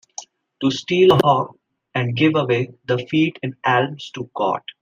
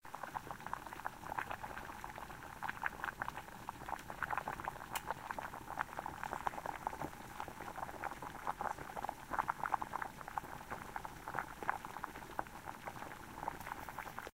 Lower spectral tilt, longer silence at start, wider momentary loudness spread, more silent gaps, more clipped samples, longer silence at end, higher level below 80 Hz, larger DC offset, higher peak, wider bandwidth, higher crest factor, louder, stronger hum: first, -6 dB/octave vs -4 dB/octave; first, 0.2 s vs 0 s; first, 15 LU vs 8 LU; neither; neither; first, 0.2 s vs 0.05 s; about the same, -60 dBFS vs -62 dBFS; neither; first, -2 dBFS vs -16 dBFS; about the same, 15 kHz vs 16 kHz; second, 18 dB vs 28 dB; first, -19 LUFS vs -45 LUFS; neither